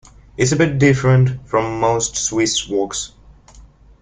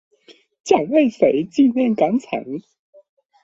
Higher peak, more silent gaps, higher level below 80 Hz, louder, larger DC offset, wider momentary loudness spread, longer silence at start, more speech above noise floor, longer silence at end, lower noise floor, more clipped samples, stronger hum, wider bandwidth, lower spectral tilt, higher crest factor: about the same, 0 dBFS vs 0 dBFS; neither; first, -44 dBFS vs -62 dBFS; about the same, -17 LUFS vs -18 LUFS; neither; second, 10 LU vs 15 LU; second, 0.4 s vs 0.65 s; second, 28 dB vs 34 dB; second, 0.35 s vs 0.85 s; second, -44 dBFS vs -52 dBFS; neither; neither; first, 9.6 kHz vs 8 kHz; second, -4.5 dB/octave vs -6 dB/octave; about the same, 18 dB vs 20 dB